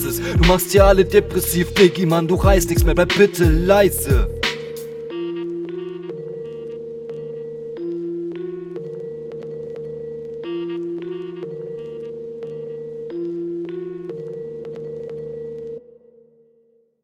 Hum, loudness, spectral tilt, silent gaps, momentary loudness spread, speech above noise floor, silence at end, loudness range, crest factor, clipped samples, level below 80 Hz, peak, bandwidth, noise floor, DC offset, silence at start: none; -20 LUFS; -5.5 dB/octave; none; 17 LU; 44 dB; 1.25 s; 14 LU; 20 dB; under 0.1%; -28 dBFS; 0 dBFS; 18.5 kHz; -59 dBFS; under 0.1%; 0 s